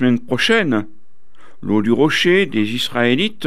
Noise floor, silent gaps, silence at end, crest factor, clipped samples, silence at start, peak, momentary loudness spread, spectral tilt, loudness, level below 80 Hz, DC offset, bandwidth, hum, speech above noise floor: -54 dBFS; none; 0 s; 14 dB; under 0.1%; 0 s; -4 dBFS; 6 LU; -5 dB/octave; -16 LUFS; -56 dBFS; 4%; 14.5 kHz; none; 37 dB